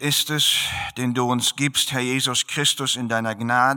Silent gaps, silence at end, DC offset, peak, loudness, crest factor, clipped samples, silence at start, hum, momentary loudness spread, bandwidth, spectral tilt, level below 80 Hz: none; 0 s; under 0.1%; -6 dBFS; -20 LUFS; 16 dB; under 0.1%; 0 s; none; 6 LU; 19 kHz; -2.5 dB/octave; -56 dBFS